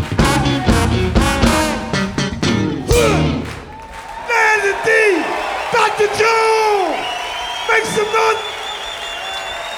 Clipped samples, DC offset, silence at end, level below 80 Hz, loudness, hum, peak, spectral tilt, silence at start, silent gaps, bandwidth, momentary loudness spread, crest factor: under 0.1%; under 0.1%; 0 s; -28 dBFS; -16 LUFS; none; 0 dBFS; -4.5 dB/octave; 0 s; none; over 20 kHz; 11 LU; 16 dB